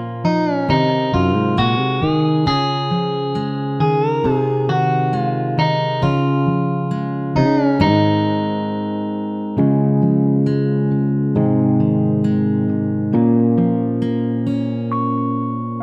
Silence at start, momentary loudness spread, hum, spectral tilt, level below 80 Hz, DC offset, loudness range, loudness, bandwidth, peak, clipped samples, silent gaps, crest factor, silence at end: 0 s; 6 LU; none; -8.5 dB/octave; -44 dBFS; under 0.1%; 2 LU; -18 LUFS; 7 kHz; -2 dBFS; under 0.1%; none; 16 dB; 0 s